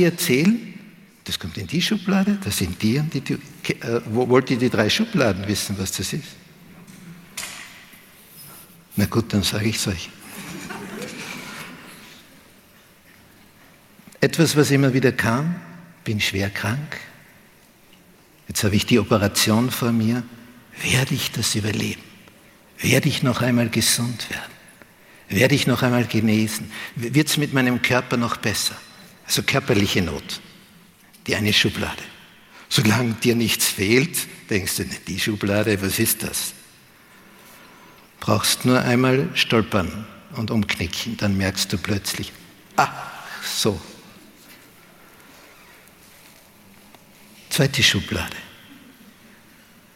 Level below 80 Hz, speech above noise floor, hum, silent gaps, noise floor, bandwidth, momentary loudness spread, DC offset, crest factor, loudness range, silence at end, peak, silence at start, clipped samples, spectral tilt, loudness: -50 dBFS; 31 dB; none; none; -52 dBFS; 17 kHz; 17 LU; under 0.1%; 22 dB; 7 LU; 1.2 s; -2 dBFS; 0 s; under 0.1%; -4 dB/octave; -21 LUFS